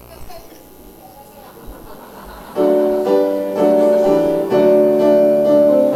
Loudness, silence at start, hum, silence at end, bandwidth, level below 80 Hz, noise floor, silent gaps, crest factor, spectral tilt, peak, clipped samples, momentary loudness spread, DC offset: -14 LUFS; 0.1 s; 60 Hz at -55 dBFS; 0 s; 15.5 kHz; -46 dBFS; -40 dBFS; none; 14 dB; -7 dB/octave; -2 dBFS; under 0.1%; 10 LU; under 0.1%